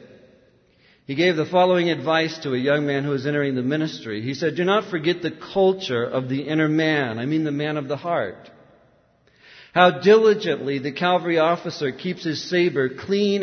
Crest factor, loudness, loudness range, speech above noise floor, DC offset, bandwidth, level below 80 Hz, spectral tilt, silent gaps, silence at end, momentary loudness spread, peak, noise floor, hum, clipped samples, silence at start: 20 dB; -21 LUFS; 4 LU; 38 dB; under 0.1%; 6.6 kHz; -66 dBFS; -6 dB/octave; none; 0 s; 9 LU; -2 dBFS; -59 dBFS; none; under 0.1%; 1.1 s